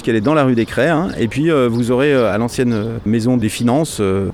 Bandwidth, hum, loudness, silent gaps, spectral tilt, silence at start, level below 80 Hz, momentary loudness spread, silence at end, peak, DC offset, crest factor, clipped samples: 15.5 kHz; none; -16 LUFS; none; -6.5 dB/octave; 0 s; -42 dBFS; 4 LU; 0 s; -4 dBFS; under 0.1%; 12 dB; under 0.1%